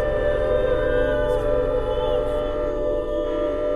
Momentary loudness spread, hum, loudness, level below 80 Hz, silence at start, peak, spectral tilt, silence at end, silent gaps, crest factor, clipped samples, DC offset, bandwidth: 4 LU; none; -23 LUFS; -30 dBFS; 0 s; -10 dBFS; -7 dB/octave; 0 s; none; 12 dB; under 0.1%; under 0.1%; 11 kHz